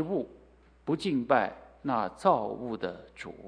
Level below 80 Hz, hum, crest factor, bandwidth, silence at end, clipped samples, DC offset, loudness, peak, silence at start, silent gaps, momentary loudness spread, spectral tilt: -62 dBFS; none; 22 dB; 10.5 kHz; 0 s; under 0.1%; under 0.1%; -30 LUFS; -8 dBFS; 0 s; none; 16 LU; -6.5 dB/octave